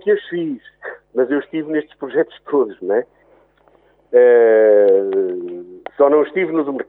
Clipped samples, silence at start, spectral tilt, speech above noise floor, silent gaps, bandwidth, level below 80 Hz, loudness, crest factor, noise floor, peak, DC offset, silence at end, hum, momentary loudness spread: under 0.1%; 0.05 s; -9.5 dB/octave; 39 dB; none; 3.9 kHz; -68 dBFS; -16 LUFS; 16 dB; -54 dBFS; 0 dBFS; under 0.1%; 0.05 s; none; 19 LU